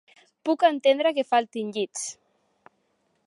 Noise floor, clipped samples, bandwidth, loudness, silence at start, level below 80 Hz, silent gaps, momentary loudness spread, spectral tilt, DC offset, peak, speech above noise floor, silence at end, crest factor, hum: -71 dBFS; under 0.1%; 11.5 kHz; -24 LUFS; 0.45 s; -84 dBFS; none; 13 LU; -2.5 dB/octave; under 0.1%; -8 dBFS; 47 dB; 1.15 s; 18 dB; none